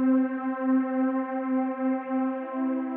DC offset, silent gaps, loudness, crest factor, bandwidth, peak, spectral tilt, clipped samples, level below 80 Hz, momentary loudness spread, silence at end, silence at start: under 0.1%; none; -27 LUFS; 12 dB; 3.1 kHz; -14 dBFS; -5.5 dB/octave; under 0.1%; under -90 dBFS; 4 LU; 0 s; 0 s